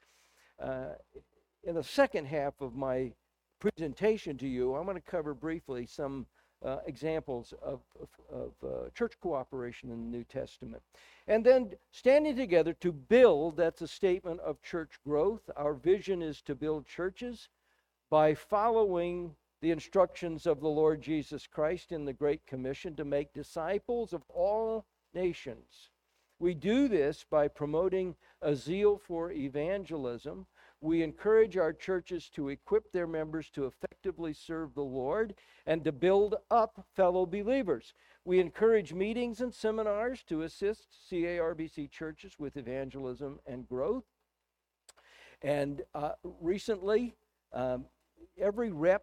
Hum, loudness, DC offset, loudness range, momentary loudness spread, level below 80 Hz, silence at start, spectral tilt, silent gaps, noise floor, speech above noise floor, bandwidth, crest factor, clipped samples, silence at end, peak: none; -33 LUFS; under 0.1%; 9 LU; 15 LU; -60 dBFS; 0.6 s; -6.5 dB/octave; none; -86 dBFS; 54 dB; 12.5 kHz; 22 dB; under 0.1%; 0.05 s; -12 dBFS